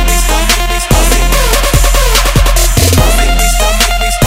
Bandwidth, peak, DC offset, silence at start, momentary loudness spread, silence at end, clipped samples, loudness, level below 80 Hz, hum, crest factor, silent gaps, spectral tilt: 16.5 kHz; 0 dBFS; under 0.1%; 0 s; 2 LU; 0 s; 0.4%; -9 LUFS; -10 dBFS; none; 8 dB; none; -3 dB/octave